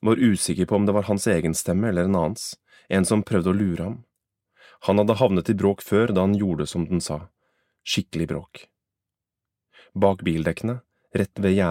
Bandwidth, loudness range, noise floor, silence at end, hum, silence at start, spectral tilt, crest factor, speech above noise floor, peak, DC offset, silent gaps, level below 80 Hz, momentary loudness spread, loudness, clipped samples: 16 kHz; 6 LU; -87 dBFS; 0 s; none; 0.05 s; -6 dB/octave; 18 dB; 65 dB; -4 dBFS; under 0.1%; none; -50 dBFS; 12 LU; -23 LUFS; under 0.1%